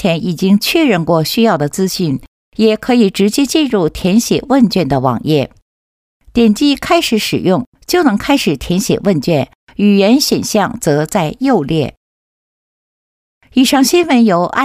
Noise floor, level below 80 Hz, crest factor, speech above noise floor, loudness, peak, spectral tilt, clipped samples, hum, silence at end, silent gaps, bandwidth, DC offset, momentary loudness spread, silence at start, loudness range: under -90 dBFS; -42 dBFS; 12 dB; over 78 dB; -13 LUFS; 0 dBFS; -5 dB/octave; under 0.1%; none; 0 s; 2.28-2.52 s, 5.62-6.20 s, 7.67-7.72 s, 9.55-9.67 s, 11.97-13.41 s; 16 kHz; under 0.1%; 6 LU; 0 s; 2 LU